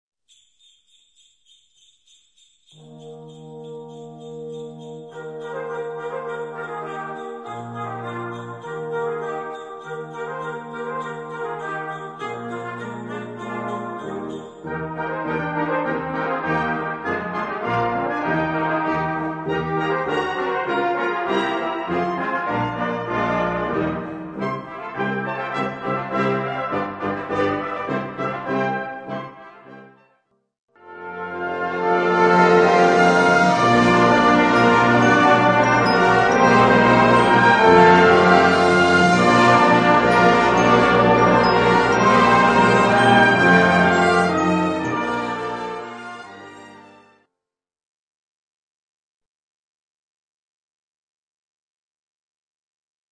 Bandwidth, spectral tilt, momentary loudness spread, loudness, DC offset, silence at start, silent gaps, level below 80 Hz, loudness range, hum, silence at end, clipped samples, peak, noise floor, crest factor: 10 kHz; -5.5 dB/octave; 18 LU; -17 LUFS; under 0.1%; 2.9 s; 30.59-30.68 s; -50 dBFS; 17 LU; none; 6.3 s; under 0.1%; 0 dBFS; -85 dBFS; 20 dB